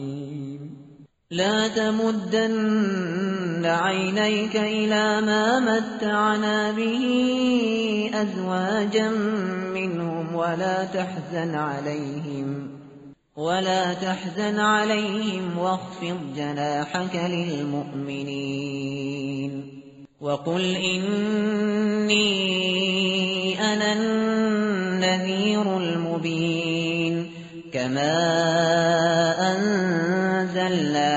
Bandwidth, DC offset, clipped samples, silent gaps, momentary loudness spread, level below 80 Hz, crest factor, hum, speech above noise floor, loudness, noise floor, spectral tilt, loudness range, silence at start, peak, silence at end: 8 kHz; under 0.1%; under 0.1%; none; 10 LU; -64 dBFS; 16 dB; none; 26 dB; -23 LUFS; -49 dBFS; -3.5 dB/octave; 6 LU; 0 s; -8 dBFS; 0 s